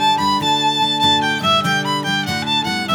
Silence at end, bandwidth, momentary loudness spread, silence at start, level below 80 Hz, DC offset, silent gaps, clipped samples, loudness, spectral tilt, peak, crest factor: 0 s; over 20 kHz; 4 LU; 0 s; -56 dBFS; under 0.1%; none; under 0.1%; -16 LUFS; -3 dB/octave; -4 dBFS; 12 dB